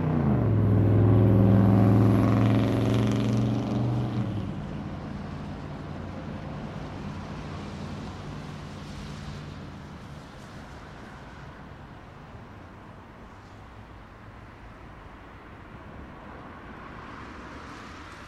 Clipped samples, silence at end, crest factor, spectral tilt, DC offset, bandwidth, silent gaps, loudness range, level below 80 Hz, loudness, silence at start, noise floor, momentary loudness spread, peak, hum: under 0.1%; 0 s; 18 dB; -8.5 dB/octave; under 0.1%; 11.5 kHz; none; 24 LU; -44 dBFS; -26 LUFS; 0 s; -46 dBFS; 26 LU; -10 dBFS; none